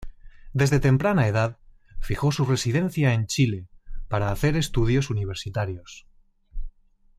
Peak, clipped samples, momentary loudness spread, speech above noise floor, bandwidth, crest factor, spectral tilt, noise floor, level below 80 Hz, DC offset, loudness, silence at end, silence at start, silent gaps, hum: -8 dBFS; under 0.1%; 17 LU; 30 dB; 14.5 kHz; 16 dB; -6 dB/octave; -53 dBFS; -38 dBFS; under 0.1%; -24 LUFS; 0.5 s; 0 s; none; none